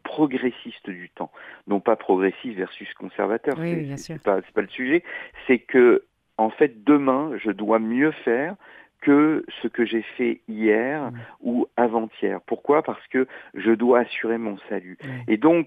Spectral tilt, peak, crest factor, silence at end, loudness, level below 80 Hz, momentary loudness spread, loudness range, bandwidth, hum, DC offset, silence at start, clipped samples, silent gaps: -7.5 dB/octave; -4 dBFS; 18 dB; 0 s; -23 LUFS; -66 dBFS; 16 LU; 5 LU; 7.6 kHz; none; under 0.1%; 0.05 s; under 0.1%; none